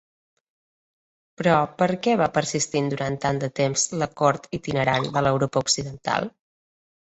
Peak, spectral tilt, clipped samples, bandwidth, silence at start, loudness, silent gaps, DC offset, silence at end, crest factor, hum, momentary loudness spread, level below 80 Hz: -4 dBFS; -4 dB/octave; under 0.1%; 8.4 kHz; 1.4 s; -23 LUFS; none; under 0.1%; 0.9 s; 20 dB; none; 5 LU; -56 dBFS